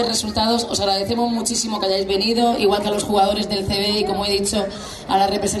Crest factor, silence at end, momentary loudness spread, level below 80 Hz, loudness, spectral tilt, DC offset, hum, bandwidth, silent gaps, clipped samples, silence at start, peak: 14 dB; 0 s; 4 LU; -44 dBFS; -19 LUFS; -3.5 dB/octave; under 0.1%; none; 13.5 kHz; none; under 0.1%; 0 s; -4 dBFS